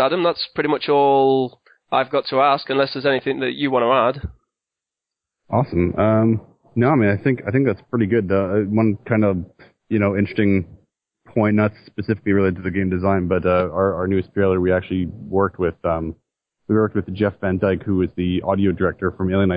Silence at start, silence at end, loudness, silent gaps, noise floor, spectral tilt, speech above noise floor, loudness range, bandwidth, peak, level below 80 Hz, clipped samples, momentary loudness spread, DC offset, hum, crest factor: 0 s; 0 s; -20 LUFS; none; -86 dBFS; -11 dB/octave; 67 dB; 3 LU; 5.2 kHz; -4 dBFS; -40 dBFS; under 0.1%; 7 LU; under 0.1%; none; 16 dB